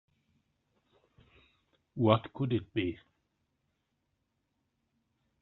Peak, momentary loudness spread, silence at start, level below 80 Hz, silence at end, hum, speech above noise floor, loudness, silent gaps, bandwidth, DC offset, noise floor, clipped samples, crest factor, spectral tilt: -10 dBFS; 17 LU; 1.95 s; -70 dBFS; 2.45 s; none; 50 dB; -31 LUFS; none; 4.2 kHz; under 0.1%; -81 dBFS; under 0.1%; 28 dB; -6 dB/octave